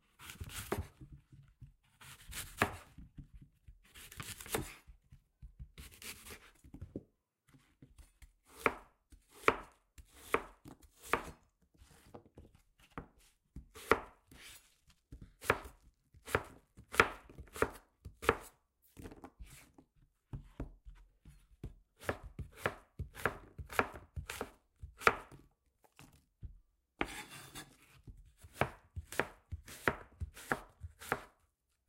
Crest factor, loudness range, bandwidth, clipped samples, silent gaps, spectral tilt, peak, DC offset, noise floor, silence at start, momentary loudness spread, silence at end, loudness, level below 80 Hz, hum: 34 dB; 12 LU; 16 kHz; under 0.1%; none; -4 dB/octave; -10 dBFS; under 0.1%; -79 dBFS; 0.2 s; 24 LU; 0.6 s; -39 LUFS; -58 dBFS; none